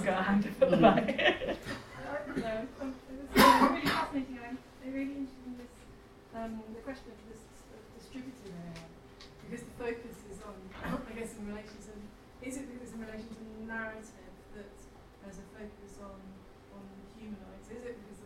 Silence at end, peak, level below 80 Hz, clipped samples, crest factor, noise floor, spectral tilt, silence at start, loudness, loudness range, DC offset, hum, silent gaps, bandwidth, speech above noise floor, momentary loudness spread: 0 s; -8 dBFS; -56 dBFS; under 0.1%; 26 dB; -54 dBFS; -5 dB/octave; 0 s; -31 LUFS; 18 LU; under 0.1%; none; none; 16.5 kHz; 25 dB; 25 LU